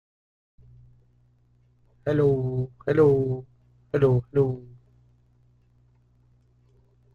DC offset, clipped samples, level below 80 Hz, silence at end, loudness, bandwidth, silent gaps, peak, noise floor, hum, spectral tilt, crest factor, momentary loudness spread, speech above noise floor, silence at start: under 0.1%; under 0.1%; -54 dBFS; 2.5 s; -24 LUFS; 6.4 kHz; none; -8 dBFS; -62 dBFS; none; -10 dB/octave; 20 dB; 12 LU; 40 dB; 2.05 s